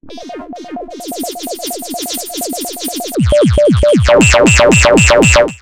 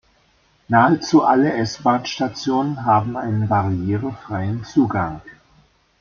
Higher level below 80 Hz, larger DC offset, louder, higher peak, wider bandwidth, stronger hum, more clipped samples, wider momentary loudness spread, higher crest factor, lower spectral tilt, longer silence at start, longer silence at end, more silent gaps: first, -22 dBFS vs -52 dBFS; neither; first, -10 LUFS vs -19 LUFS; about the same, 0 dBFS vs -2 dBFS; first, 17 kHz vs 7.2 kHz; neither; neither; first, 20 LU vs 10 LU; second, 12 dB vs 18 dB; second, -4.5 dB/octave vs -6.5 dB/octave; second, 0.05 s vs 0.7 s; second, 0.05 s vs 0.7 s; neither